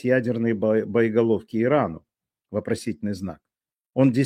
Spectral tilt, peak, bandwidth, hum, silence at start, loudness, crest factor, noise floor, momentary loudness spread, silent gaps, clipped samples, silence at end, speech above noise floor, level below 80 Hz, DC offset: -7.5 dB/octave; -6 dBFS; 12.5 kHz; none; 0.05 s; -24 LUFS; 18 dB; -68 dBFS; 11 LU; 3.81-3.85 s; under 0.1%; 0 s; 46 dB; -60 dBFS; under 0.1%